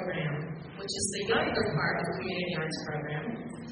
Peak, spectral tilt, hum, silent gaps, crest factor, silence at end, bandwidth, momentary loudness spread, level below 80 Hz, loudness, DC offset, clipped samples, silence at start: -14 dBFS; -4 dB/octave; none; none; 18 dB; 0 s; 9.6 kHz; 10 LU; -58 dBFS; -32 LUFS; under 0.1%; under 0.1%; 0 s